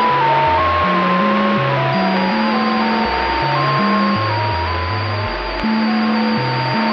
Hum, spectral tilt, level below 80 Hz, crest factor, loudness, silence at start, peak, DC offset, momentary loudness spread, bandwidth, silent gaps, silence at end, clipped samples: none; -7.5 dB/octave; -36 dBFS; 14 dB; -16 LUFS; 0 s; -4 dBFS; under 0.1%; 5 LU; 6.6 kHz; none; 0 s; under 0.1%